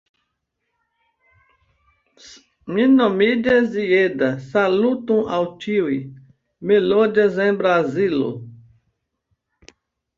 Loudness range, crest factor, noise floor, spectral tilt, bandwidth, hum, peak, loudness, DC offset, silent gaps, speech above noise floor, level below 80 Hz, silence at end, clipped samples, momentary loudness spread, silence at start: 4 LU; 16 dB; -76 dBFS; -7 dB/octave; 7.4 kHz; none; -4 dBFS; -18 LUFS; under 0.1%; none; 58 dB; -60 dBFS; 1.65 s; under 0.1%; 11 LU; 2.25 s